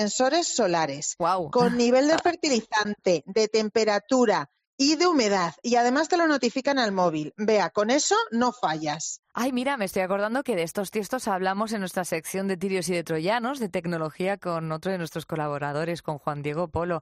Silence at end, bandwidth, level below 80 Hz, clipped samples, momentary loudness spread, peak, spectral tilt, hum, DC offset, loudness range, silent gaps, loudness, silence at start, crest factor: 0 s; 14 kHz; -64 dBFS; under 0.1%; 8 LU; -10 dBFS; -4 dB/octave; none; under 0.1%; 5 LU; 4.67-4.78 s, 9.19-9.23 s; -25 LUFS; 0 s; 16 dB